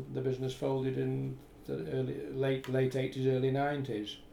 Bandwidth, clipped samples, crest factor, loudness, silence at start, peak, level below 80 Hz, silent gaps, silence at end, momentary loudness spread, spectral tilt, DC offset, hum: 14 kHz; under 0.1%; 14 dB; -34 LUFS; 0 s; -20 dBFS; -60 dBFS; none; 0 s; 8 LU; -7.5 dB/octave; under 0.1%; none